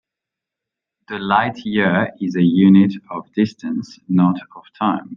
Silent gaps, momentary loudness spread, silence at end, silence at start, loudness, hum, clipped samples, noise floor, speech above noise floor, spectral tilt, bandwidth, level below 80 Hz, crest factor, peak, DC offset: none; 15 LU; 0 s; 1.1 s; -17 LUFS; none; under 0.1%; -85 dBFS; 68 dB; -8 dB/octave; 6.8 kHz; -62 dBFS; 16 dB; -2 dBFS; under 0.1%